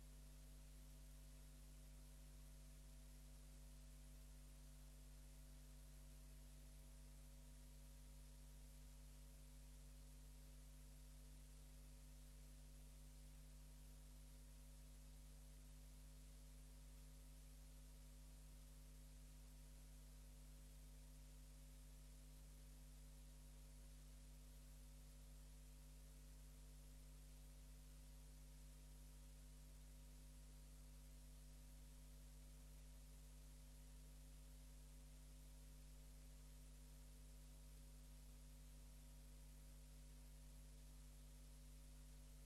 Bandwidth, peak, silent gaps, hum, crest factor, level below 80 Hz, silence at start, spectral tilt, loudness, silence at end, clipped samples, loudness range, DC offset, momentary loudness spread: 15.5 kHz; -52 dBFS; none; 50 Hz at -60 dBFS; 8 dB; -62 dBFS; 0 s; -4.5 dB/octave; -65 LUFS; 0 s; under 0.1%; 0 LU; under 0.1%; 0 LU